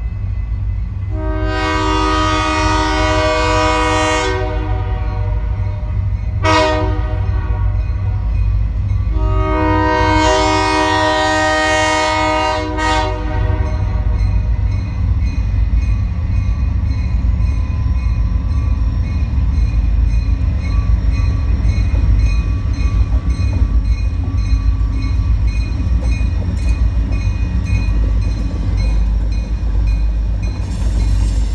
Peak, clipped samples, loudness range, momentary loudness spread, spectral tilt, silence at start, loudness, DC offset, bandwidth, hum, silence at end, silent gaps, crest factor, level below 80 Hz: 0 dBFS; under 0.1%; 4 LU; 6 LU; -6 dB/octave; 0 s; -17 LUFS; under 0.1%; 9.6 kHz; none; 0 s; none; 14 dB; -18 dBFS